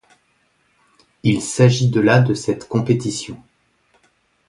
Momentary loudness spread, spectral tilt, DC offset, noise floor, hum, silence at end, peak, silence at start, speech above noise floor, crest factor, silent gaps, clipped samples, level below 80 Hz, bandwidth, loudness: 13 LU; -6 dB/octave; under 0.1%; -63 dBFS; none; 1.15 s; 0 dBFS; 1.25 s; 46 dB; 20 dB; none; under 0.1%; -52 dBFS; 11.5 kHz; -17 LUFS